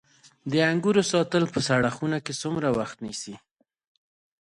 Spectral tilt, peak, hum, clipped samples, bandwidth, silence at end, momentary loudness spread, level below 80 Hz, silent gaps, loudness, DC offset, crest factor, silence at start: -5 dB/octave; -8 dBFS; none; under 0.1%; 11.5 kHz; 1.05 s; 12 LU; -60 dBFS; none; -25 LUFS; under 0.1%; 18 dB; 0.45 s